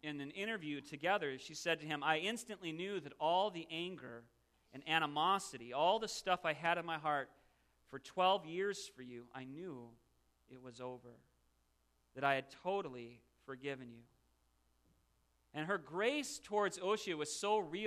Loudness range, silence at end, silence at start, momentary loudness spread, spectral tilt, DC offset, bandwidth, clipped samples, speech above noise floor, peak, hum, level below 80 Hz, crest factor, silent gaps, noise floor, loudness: 10 LU; 0 s; 0.05 s; 18 LU; -3.5 dB/octave; under 0.1%; 14 kHz; under 0.1%; 38 dB; -18 dBFS; none; -78 dBFS; 24 dB; none; -78 dBFS; -39 LUFS